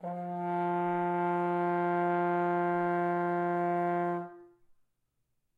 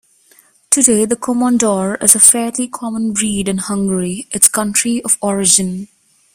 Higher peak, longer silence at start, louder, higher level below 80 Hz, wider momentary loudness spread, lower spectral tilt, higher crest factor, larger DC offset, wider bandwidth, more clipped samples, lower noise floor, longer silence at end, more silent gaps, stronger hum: second, -22 dBFS vs 0 dBFS; second, 0 s vs 0.7 s; second, -31 LUFS vs -13 LUFS; second, -82 dBFS vs -50 dBFS; second, 5 LU vs 12 LU; first, -9.5 dB/octave vs -3 dB/octave; second, 10 dB vs 16 dB; neither; second, 4.4 kHz vs over 20 kHz; second, under 0.1% vs 0.3%; first, -79 dBFS vs -50 dBFS; first, 1.1 s vs 0.5 s; neither; neither